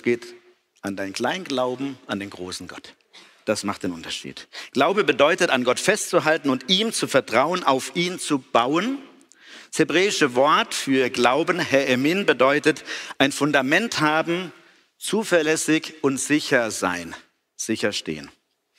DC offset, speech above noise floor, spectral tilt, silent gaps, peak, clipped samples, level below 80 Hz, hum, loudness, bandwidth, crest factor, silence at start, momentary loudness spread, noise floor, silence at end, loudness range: under 0.1%; 26 dB; -3.5 dB/octave; none; -4 dBFS; under 0.1%; -66 dBFS; none; -21 LUFS; 16 kHz; 20 dB; 0.05 s; 14 LU; -48 dBFS; 0.5 s; 8 LU